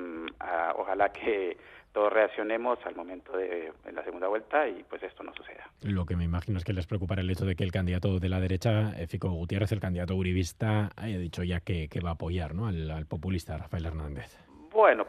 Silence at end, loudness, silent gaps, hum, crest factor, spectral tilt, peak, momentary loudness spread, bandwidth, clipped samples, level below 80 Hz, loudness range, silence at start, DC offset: 0 s; -31 LUFS; none; none; 22 dB; -7 dB/octave; -8 dBFS; 12 LU; 13.5 kHz; under 0.1%; -50 dBFS; 4 LU; 0 s; under 0.1%